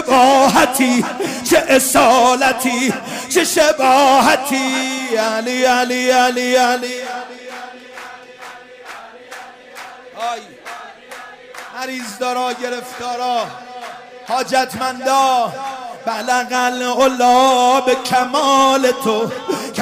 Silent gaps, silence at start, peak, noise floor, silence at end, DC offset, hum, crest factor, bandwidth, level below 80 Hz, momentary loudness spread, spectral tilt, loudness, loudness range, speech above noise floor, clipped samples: none; 0 s; -2 dBFS; -36 dBFS; 0 s; under 0.1%; none; 14 dB; 16 kHz; -54 dBFS; 23 LU; -2.5 dB/octave; -15 LUFS; 17 LU; 22 dB; under 0.1%